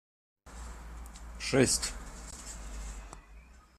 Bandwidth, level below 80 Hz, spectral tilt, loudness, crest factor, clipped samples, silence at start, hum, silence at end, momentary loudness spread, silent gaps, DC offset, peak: 15 kHz; -46 dBFS; -3.5 dB/octave; -32 LUFS; 26 dB; under 0.1%; 0.45 s; none; 0.15 s; 22 LU; none; under 0.1%; -10 dBFS